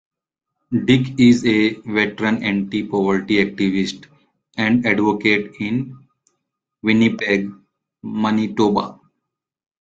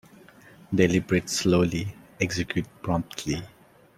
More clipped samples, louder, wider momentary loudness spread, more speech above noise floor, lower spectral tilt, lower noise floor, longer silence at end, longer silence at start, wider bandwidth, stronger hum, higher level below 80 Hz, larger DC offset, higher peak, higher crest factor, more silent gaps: neither; first, -18 LUFS vs -26 LUFS; about the same, 11 LU vs 10 LU; first, 61 dB vs 26 dB; about the same, -6 dB/octave vs -5 dB/octave; first, -79 dBFS vs -51 dBFS; first, 0.95 s vs 0.5 s; about the same, 0.7 s vs 0.7 s; second, 7.8 kHz vs 15.5 kHz; neither; about the same, -54 dBFS vs -52 dBFS; neither; first, -2 dBFS vs -6 dBFS; about the same, 18 dB vs 20 dB; neither